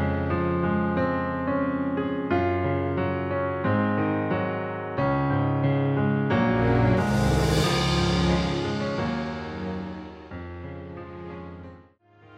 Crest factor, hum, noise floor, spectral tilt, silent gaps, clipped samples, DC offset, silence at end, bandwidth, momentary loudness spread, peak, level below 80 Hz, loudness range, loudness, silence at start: 16 dB; none; -54 dBFS; -6.5 dB/octave; none; under 0.1%; under 0.1%; 0 s; 15 kHz; 16 LU; -10 dBFS; -40 dBFS; 8 LU; -25 LUFS; 0 s